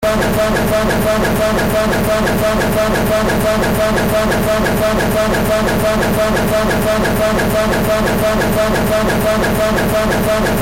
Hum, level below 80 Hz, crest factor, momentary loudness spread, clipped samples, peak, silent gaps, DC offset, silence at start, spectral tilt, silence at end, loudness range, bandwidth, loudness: none; -26 dBFS; 8 dB; 0 LU; under 0.1%; -6 dBFS; none; under 0.1%; 0 s; -5 dB/octave; 0 s; 0 LU; 17 kHz; -14 LUFS